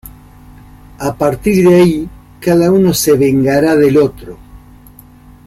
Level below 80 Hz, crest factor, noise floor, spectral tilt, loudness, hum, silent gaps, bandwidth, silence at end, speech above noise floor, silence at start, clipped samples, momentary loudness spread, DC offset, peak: -38 dBFS; 12 dB; -39 dBFS; -6 dB/octave; -11 LUFS; none; none; 16.5 kHz; 0.9 s; 29 dB; 0.05 s; under 0.1%; 13 LU; under 0.1%; 0 dBFS